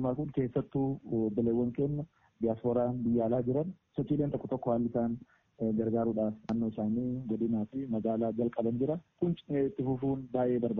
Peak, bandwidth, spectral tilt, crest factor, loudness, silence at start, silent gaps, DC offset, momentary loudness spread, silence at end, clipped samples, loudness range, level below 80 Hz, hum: -16 dBFS; 3.9 kHz; -10 dB/octave; 16 dB; -33 LUFS; 0 s; none; under 0.1%; 4 LU; 0 s; under 0.1%; 1 LU; -60 dBFS; none